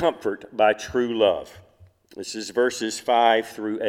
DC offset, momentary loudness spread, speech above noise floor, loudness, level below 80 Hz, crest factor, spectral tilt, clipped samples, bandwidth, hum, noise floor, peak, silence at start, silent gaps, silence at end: under 0.1%; 12 LU; 30 dB; -23 LUFS; -60 dBFS; 18 dB; -3.5 dB/octave; under 0.1%; 16 kHz; none; -53 dBFS; -4 dBFS; 0 s; none; 0 s